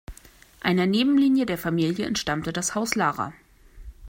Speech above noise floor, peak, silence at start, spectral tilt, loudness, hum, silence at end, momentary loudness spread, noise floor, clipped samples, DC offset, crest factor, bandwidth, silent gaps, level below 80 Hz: 27 dB; -4 dBFS; 0.1 s; -4.5 dB/octave; -24 LUFS; none; 0 s; 8 LU; -50 dBFS; under 0.1%; under 0.1%; 22 dB; 16 kHz; none; -50 dBFS